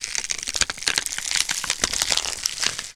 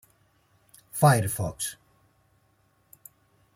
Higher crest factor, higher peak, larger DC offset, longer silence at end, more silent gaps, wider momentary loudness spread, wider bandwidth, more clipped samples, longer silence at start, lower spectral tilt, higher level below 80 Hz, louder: about the same, 26 dB vs 22 dB; first, 0 dBFS vs -8 dBFS; neither; second, 0 s vs 1.85 s; neither; second, 4 LU vs 13 LU; first, over 20 kHz vs 16.5 kHz; neither; second, 0 s vs 0.95 s; second, 1 dB/octave vs -5 dB/octave; first, -48 dBFS vs -60 dBFS; first, -22 LUFS vs -25 LUFS